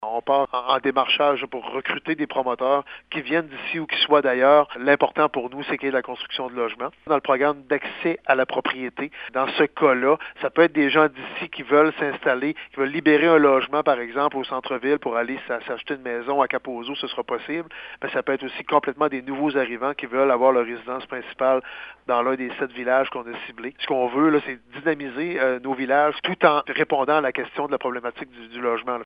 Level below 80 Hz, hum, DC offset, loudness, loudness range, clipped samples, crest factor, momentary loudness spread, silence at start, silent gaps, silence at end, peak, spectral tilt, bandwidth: -66 dBFS; none; under 0.1%; -22 LUFS; 5 LU; under 0.1%; 20 dB; 12 LU; 0 s; none; 0 s; -2 dBFS; -8 dB/octave; 5.2 kHz